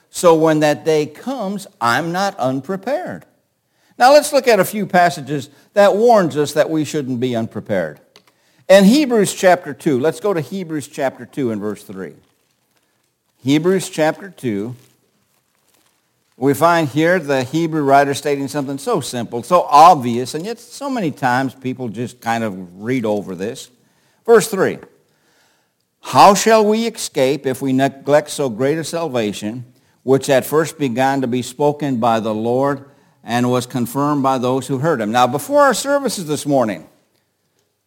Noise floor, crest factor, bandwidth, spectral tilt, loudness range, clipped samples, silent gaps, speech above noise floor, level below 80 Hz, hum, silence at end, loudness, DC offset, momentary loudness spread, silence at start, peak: -65 dBFS; 16 dB; 17 kHz; -5 dB/octave; 7 LU; under 0.1%; none; 49 dB; -64 dBFS; none; 1.05 s; -16 LUFS; under 0.1%; 14 LU; 0.15 s; 0 dBFS